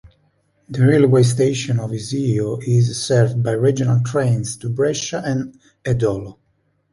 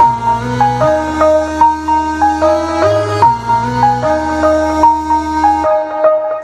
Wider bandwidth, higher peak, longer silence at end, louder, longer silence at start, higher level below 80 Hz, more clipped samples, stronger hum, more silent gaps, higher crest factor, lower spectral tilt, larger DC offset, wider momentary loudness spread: about the same, 11.5 kHz vs 12.5 kHz; about the same, -2 dBFS vs 0 dBFS; first, 0.6 s vs 0 s; second, -18 LUFS vs -12 LUFS; about the same, 0.05 s vs 0 s; second, -50 dBFS vs -34 dBFS; neither; neither; neither; about the same, 16 dB vs 12 dB; about the same, -6.5 dB/octave vs -6 dB/octave; neither; first, 11 LU vs 4 LU